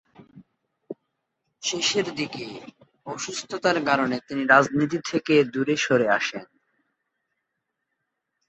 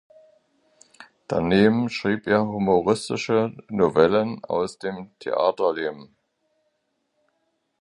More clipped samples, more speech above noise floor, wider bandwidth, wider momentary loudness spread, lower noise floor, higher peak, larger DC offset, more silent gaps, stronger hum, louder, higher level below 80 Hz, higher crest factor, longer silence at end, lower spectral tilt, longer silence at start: neither; first, 57 dB vs 52 dB; second, 8.4 kHz vs 11 kHz; first, 23 LU vs 10 LU; first, -80 dBFS vs -73 dBFS; about the same, -4 dBFS vs -2 dBFS; neither; neither; neither; about the same, -23 LUFS vs -22 LUFS; second, -68 dBFS vs -56 dBFS; about the same, 22 dB vs 22 dB; first, 2.05 s vs 1.75 s; second, -3.5 dB/octave vs -6.5 dB/octave; second, 0.2 s vs 1 s